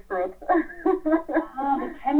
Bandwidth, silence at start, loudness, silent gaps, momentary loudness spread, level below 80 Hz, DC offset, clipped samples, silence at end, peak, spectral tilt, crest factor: 4.2 kHz; 0.1 s; -25 LUFS; none; 5 LU; -50 dBFS; under 0.1%; under 0.1%; 0 s; -8 dBFS; -7 dB/octave; 18 dB